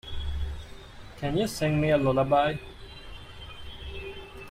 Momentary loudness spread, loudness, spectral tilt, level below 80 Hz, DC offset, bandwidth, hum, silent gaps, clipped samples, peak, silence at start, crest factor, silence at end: 21 LU; -27 LUFS; -6 dB/octave; -42 dBFS; under 0.1%; 15.5 kHz; none; none; under 0.1%; -10 dBFS; 0.05 s; 18 dB; 0 s